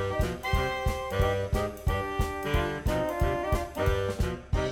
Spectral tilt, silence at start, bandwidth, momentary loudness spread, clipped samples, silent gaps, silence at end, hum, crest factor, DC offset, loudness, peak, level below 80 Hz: -6 dB/octave; 0 s; 18 kHz; 3 LU; under 0.1%; none; 0 s; none; 16 dB; under 0.1%; -30 LUFS; -14 dBFS; -34 dBFS